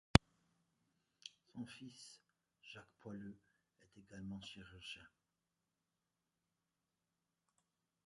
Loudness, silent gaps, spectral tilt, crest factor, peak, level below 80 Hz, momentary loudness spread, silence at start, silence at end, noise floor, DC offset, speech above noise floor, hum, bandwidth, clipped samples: -45 LUFS; none; -5 dB/octave; 42 dB; -4 dBFS; -56 dBFS; 12 LU; 0.15 s; 3 s; -90 dBFS; under 0.1%; 36 dB; none; 11 kHz; under 0.1%